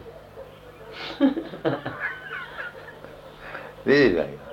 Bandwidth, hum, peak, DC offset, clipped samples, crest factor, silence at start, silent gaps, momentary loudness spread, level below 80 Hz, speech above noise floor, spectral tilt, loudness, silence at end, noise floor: 15.5 kHz; none; -6 dBFS; under 0.1%; under 0.1%; 20 dB; 0 s; none; 24 LU; -54 dBFS; 22 dB; -6.5 dB/octave; -25 LUFS; 0 s; -44 dBFS